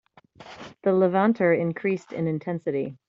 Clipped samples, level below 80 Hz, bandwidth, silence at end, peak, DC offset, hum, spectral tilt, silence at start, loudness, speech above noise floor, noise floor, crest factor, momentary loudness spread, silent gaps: under 0.1%; -68 dBFS; 7.4 kHz; 0.15 s; -8 dBFS; under 0.1%; none; -8.5 dB/octave; 0.4 s; -24 LUFS; 25 dB; -48 dBFS; 18 dB; 8 LU; none